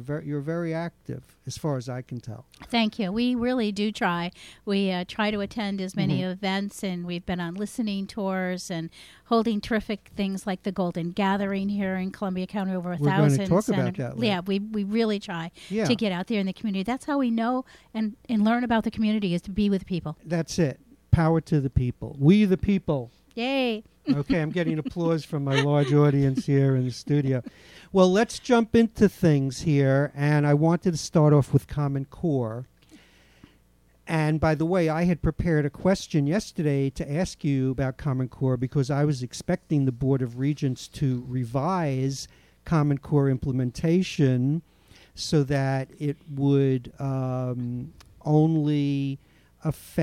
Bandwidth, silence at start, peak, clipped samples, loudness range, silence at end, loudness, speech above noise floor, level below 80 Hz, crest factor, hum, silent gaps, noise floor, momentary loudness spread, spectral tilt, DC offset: 14 kHz; 0 s; -6 dBFS; under 0.1%; 6 LU; 0 s; -25 LUFS; 36 dB; -48 dBFS; 20 dB; none; none; -61 dBFS; 10 LU; -7 dB/octave; under 0.1%